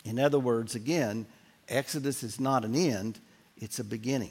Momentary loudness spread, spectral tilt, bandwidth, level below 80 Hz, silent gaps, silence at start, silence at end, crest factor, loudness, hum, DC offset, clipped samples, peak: 12 LU; -5 dB/octave; 16.5 kHz; -74 dBFS; none; 0.05 s; 0 s; 18 dB; -31 LUFS; none; under 0.1%; under 0.1%; -12 dBFS